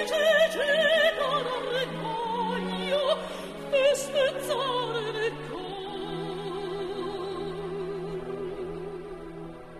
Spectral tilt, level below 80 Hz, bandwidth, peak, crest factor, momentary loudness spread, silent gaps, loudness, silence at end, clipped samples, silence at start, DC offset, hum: -3.5 dB/octave; -54 dBFS; 13 kHz; -12 dBFS; 18 dB; 14 LU; none; -28 LUFS; 0 s; under 0.1%; 0 s; under 0.1%; none